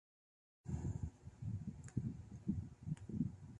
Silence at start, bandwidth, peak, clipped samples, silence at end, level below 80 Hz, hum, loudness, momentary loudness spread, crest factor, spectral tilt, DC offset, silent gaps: 0.65 s; 11 kHz; -26 dBFS; under 0.1%; 0 s; -56 dBFS; none; -47 LUFS; 5 LU; 20 dB; -8.5 dB/octave; under 0.1%; none